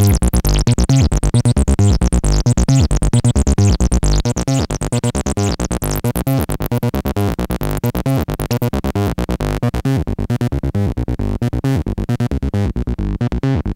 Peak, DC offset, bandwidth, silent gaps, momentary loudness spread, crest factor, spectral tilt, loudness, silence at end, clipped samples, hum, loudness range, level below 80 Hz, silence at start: -2 dBFS; under 0.1%; 16.5 kHz; none; 6 LU; 14 dB; -6 dB/octave; -17 LUFS; 0 s; under 0.1%; none; 5 LU; -20 dBFS; 0 s